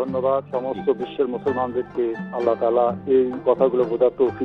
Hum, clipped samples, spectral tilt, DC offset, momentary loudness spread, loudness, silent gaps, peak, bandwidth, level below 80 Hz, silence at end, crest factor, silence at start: none; under 0.1%; -9 dB/octave; under 0.1%; 6 LU; -22 LUFS; none; -6 dBFS; 5 kHz; -58 dBFS; 0 s; 16 dB; 0 s